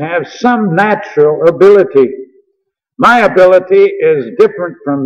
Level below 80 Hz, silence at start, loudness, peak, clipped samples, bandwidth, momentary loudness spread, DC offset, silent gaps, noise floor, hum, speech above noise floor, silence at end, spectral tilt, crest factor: -52 dBFS; 0 s; -9 LUFS; 0 dBFS; 0.3%; 8.4 kHz; 8 LU; under 0.1%; none; -66 dBFS; none; 57 dB; 0 s; -7 dB/octave; 10 dB